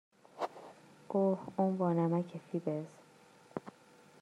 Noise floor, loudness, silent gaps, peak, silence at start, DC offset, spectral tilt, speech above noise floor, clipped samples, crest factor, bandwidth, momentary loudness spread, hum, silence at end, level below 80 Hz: -62 dBFS; -36 LUFS; none; -18 dBFS; 0.35 s; under 0.1%; -9 dB/octave; 28 dB; under 0.1%; 18 dB; 11 kHz; 19 LU; none; 0.5 s; -84 dBFS